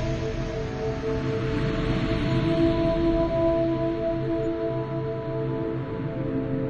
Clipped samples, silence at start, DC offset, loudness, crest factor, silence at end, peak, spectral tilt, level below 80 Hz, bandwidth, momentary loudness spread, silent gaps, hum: under 0.1%; 0 s; under 0.1%; -26 LUFS; 14 dB; 0 s; -12 dBFS; -8 dB/octave; -38 dBFS; 7.6 kHz; 7 LU; none; none